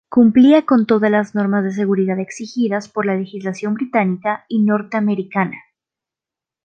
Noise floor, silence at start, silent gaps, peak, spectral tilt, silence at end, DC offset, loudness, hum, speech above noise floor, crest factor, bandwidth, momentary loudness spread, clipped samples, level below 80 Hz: -88 dBFS; 0.1 s; none; -2 dBFS; -7.5 dB/octave; 1.05 s; under 0.1%; -17 LUFS; none; 72 dB; 14 dB; 8.6 kHz; 12 LU; under 0.1%; -62 dBFS